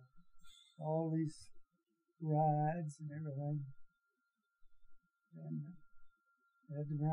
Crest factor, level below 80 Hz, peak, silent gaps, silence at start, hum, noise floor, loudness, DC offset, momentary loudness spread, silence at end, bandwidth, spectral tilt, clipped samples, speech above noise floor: 18 dB; -74 dBFS; -24 dBFS; none; 0 s; none; -86 dBFS; -40 LUFS; under 0.1%; 17 LU; 0 s; 11 kHz; -9 dB/octave; under 0.1%; 47 dB